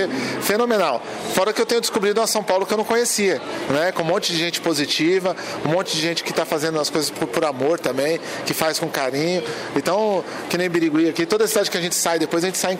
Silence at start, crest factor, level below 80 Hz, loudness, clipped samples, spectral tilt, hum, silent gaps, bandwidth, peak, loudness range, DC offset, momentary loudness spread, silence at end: 0 s; 20 dB; -64 dBFS; -20 LUFS; under 0.1%; -3 dB/octave; none; none; 16 kHz; 0 dBFS; 2 LU; under 0.1%; 5 LU; 0 s